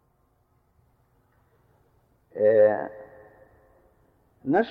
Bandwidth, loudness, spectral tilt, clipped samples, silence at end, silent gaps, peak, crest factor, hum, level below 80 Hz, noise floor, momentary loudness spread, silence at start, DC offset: 4.6 kHz; -23 LUFS; -9 dB/octave; under 0.1%; 0 s; none; -10 dBFS; 18 dB; none; -68 dBFS; -67 dBFS; 22 LU; 2.35 s; under 0.1%